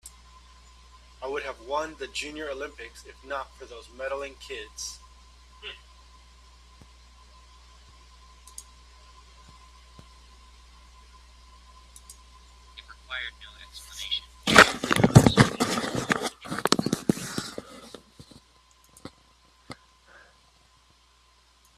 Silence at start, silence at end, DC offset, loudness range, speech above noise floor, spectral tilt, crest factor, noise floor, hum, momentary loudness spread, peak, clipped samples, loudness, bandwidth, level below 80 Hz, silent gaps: 0.05 s; 2.05 s; under 0.1%; 22 LU; 25 dB; -4.5 dB/octave; 30 dB; -61 dBFS; none; 29 LU; 0 dBFS; under 0.1%; -25 LUFS; 15 kHz; -50 dBFS; none